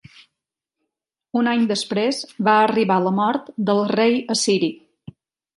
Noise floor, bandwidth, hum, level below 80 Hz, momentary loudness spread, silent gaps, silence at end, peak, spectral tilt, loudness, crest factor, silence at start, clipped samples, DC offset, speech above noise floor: -83 dBFS; 11.5 kHz; none; -68 dBFS; 7 LU; none; 0.8 s; -4 dBFS; -4.5 dB/octave; -19 LUFS; 18 dB; 1.35 s; under 0.1%; under 0.1%; 64 dB